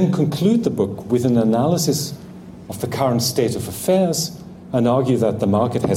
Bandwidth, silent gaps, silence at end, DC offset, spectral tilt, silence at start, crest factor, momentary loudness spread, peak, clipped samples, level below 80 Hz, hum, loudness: 16.5 kHz; none; 0 s; under 0.1%; -6 dB/octave; 0 s; 12 dB; 12 LU; -6 dBFS; under 0.1%; -50 dBFS; none; -19 LUFS